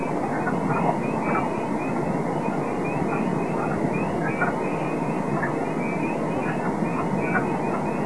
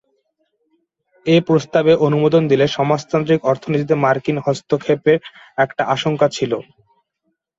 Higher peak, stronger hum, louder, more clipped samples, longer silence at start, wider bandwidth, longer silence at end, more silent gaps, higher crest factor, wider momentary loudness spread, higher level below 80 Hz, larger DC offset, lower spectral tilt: second, -8 dBFS vs -2 dBFS; neither; second, -25 LUFS vs -17 LUFS; neither; second, 0 s vs 1.25 s; first, 11 kHz vs 7.8 kHz; second, 0 s vs 0.95 s; neither; about the same, 16 dB vs 16 dB; second, 2 LU vs 6 LU; about the same, -52 dBFS vs -56 dBFS; first, 1% vs under 0.1%; about the same, -7.5 dB/octave vs -6.5 dB/octave